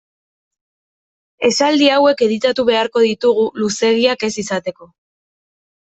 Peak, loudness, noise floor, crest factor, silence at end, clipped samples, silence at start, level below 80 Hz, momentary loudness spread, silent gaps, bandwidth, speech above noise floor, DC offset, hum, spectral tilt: 0 dBFS; -15 LUFS; under -90 dBFS; 16 dB; 1 s; under 0.1%; 1.4 s; -60 dBFS; 9 LU; none; 8.4 kHz; over 75 dB; under 0.1%; none; -3.5 dB/octave